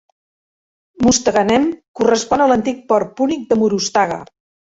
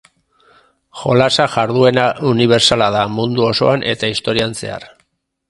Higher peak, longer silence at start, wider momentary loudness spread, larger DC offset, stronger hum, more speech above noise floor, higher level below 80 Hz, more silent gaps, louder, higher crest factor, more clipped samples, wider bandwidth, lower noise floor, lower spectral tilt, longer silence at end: about the same, -2 dBFS vs 0 dBFS; about the same, 1 s vs 0.95 s; second, 6 LU vs 10 LU; neither; neither; first, over 74 dB vs 48 dB; about the same, -48 dBFS vs -48 dBFS; first, 1.88-1.94 s vs none; about the same, -16 LUFS vs -14 LUFS; about the same, 16 dB vs 16 dB; neither; second, 8 kHz vs 11.5 kHz; first, under -90 dBFS vs -62 dBFS; about the same, -4 dB/octave vs -4.5 dB/octave; second, 0.45 s vs 0.65 s